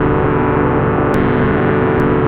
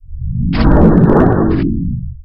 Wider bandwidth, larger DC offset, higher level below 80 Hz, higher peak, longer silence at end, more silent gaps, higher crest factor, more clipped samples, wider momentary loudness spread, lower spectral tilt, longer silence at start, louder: about the same, 5.6 kHz vs 5.6 kHz; neither; second, -28 dBFS vs -18 dBFS; about the same, -2 dBFS vs 0 dBFS; about the same, 0 s vs 0 s; neither; about the same, 12 dB vs 12 dB; second, under 0.1% vs 0.5%; second, 1 LU vs 12 LU; second, -9.5 dB/octave vs -11 dB/octave; about the same, 0 s vs 0 s; about the same, -14 LUFS vs -12 LUFS